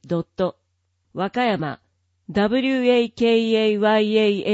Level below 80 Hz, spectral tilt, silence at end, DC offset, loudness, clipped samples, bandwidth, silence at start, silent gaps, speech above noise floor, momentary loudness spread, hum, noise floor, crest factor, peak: -58 dBFS; -6.5 dB/octave; 0 s; under 0.1%; -20 LUFS; under 0.1%; 8 kHz; 0.05 s; none; 51 dB; 10 LU; none; -70 dBFS; 14 dB; -6 dBFS